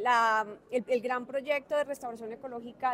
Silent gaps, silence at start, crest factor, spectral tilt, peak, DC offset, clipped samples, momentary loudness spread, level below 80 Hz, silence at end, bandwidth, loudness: none; 0 s; 18 dB; -3.5 dB/octave; -14 dBFS; under 0.1%; under 0.1%; 15 LU; -74 dBFS; 0 s; 16 kHz; -31 LUFS